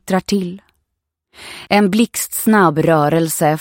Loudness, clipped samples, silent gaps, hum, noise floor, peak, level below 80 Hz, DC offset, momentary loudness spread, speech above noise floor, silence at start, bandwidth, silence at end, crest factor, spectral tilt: -15 LUFS; under 0.1%; none; none; -76 dBFS; 0 dBFS; -52 dBFS; under 0.1%; 12 LU; 61 dB; 0.05 s; 17 kHz; 0 s; 16 dB; -5 dB/octave